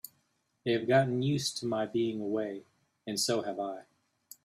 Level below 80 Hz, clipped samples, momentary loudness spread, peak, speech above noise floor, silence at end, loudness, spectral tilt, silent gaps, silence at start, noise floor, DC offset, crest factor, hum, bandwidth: -72 dBFS; under 0.1%; 17 LU; -12 dBFS; 45 dB; 0.65 s; -31 LUFS; -4.5 dB/octave; none; 0.05 s; -75 dBFS; under 0.1%; 20 dB; none; 15.5 kHz